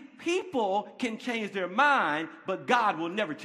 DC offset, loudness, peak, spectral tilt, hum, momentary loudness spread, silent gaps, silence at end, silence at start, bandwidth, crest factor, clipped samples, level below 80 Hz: under 0.1%; -28 LUFS; -10 dBFS; -4 dB/octave; none; 10 LU; none; 0 s; 0 s; 13 kHz; 20 dB; under 0.1%; -80 dBFS